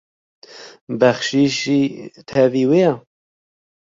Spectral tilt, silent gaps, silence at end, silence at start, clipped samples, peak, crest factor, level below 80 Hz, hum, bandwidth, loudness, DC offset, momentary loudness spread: -5.5 dB/octave; 0.81-0.87 s; 0.95 s; 0.55 s; under 0.1%; -2 dBFS; 18 dB; -60 dBFS; none; 7.8 kHz; -17 LUFS; under 0.1%; 18 LU